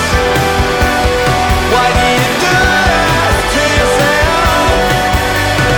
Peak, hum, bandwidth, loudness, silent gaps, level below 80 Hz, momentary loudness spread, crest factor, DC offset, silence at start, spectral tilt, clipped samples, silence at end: -2 dBFS; none; over 20 kHz; -10 LUFS; none; -20 dBFS; 2 LU; 8 dB; under 0.1%; 0 s; -4 dB/octave; under 0.1%; 0 s